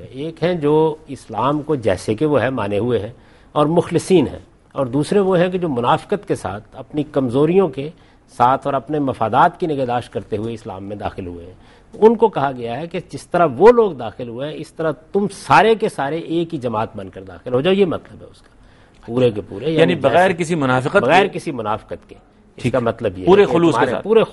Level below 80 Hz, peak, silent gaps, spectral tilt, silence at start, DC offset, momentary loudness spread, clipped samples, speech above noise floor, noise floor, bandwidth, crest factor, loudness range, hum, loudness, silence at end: -48 dBFS; 0 dBFS; none; -6.5 dB/octave; 0 s; under 0.1%; 15 LU; under 0.1%; 30 dB; -47 dBFS; 11.5 kHz; 18 dB; 4 LU; none; -17 LUFS; 0 s